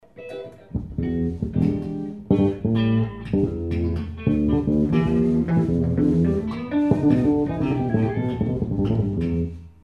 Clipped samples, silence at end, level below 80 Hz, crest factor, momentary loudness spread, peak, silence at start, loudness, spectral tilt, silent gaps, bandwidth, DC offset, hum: under 0.1%; 0.15 s; -38 dBFS; 18 dB; 10 LU; -4 dBFS; 0.15 s; -22 LUFS; -10 dB/octave; none; 6.8 kHz; 0.1%; none